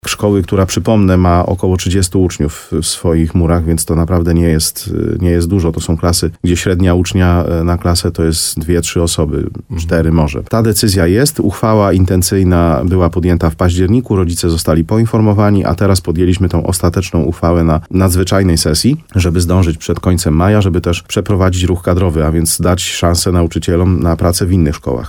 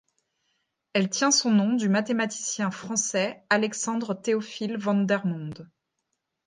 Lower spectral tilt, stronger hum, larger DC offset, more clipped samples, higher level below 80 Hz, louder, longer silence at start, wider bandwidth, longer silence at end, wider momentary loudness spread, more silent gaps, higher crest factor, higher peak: first, -5.5 dB/octave vs -3.5 dB/octave; neither; neither; neither; first, -24 dBFS vs -74 dBFS; first, -12 LUFS vs -25 LUFS; second, 0.05 s vs 0.95 s; first, 17.5 kHz vs 9.8 kHz; second, 0 s vs 0.8 s; second, 4 LU vs 9 LU; neither; second, 12 dB vs 20 dB; first, 0 dBFS vs -8 dBFS